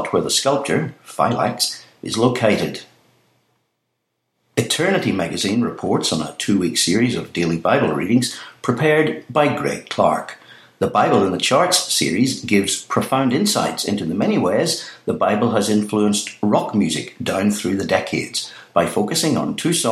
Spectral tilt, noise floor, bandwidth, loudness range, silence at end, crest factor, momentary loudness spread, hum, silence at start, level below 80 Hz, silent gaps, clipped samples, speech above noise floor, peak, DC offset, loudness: -4 dB/octave; -74 dBFS; 15.5 kHz; 4 LU; 0 s; 18 dB; 7 LU; none; 0 s; -58 dBFS; none; under 0.1%; 55 dB; -2 dBFS; under 0.1%; -19 LUFS